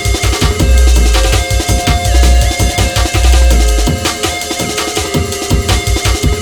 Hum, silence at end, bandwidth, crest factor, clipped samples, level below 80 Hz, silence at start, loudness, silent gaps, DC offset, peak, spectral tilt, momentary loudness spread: none; 0 s; 18.5 kHz; 10 dB; under 0.1%; -12 dBFS; 0 s; -12 LUFS; none; under 0.1%; 0 dBFS; -4 dB/octave; 5 LU